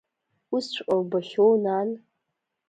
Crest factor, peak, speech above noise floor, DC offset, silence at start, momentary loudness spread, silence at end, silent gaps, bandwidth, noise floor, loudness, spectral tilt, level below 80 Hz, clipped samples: 16 dB; -10 dBFS; 57 dB; under 0.1%; 0.5 s; 11 LU; 0.7 s; none; 9 kHz; -81 dBFS; -25 LUFS; -6 dB/octave; -74 dBFS; under 0.1%